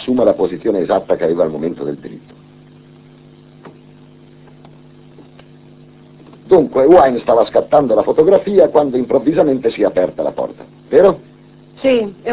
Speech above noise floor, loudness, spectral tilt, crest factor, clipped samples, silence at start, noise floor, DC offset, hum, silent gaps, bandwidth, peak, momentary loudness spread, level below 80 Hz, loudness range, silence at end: 29 dB; -14 LUFS; -10.5 dB/octave; 14 dB; under 0.1%; 0 s; -42 dBFS; under 0.1%; none; none; 4 kHz; 0 dBFS; 11 LU; -50 dBFS; 11 LU; 0 s